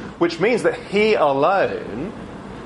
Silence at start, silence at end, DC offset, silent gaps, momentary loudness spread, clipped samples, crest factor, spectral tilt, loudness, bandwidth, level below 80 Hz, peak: 0 s; 0 s; under 0.1%; none; 14 LU; under 0.1%; 14 dB; -5.5 dB/octave; -19 LUFS; 11.5 kHz; -50 dBFS; -6 dBFS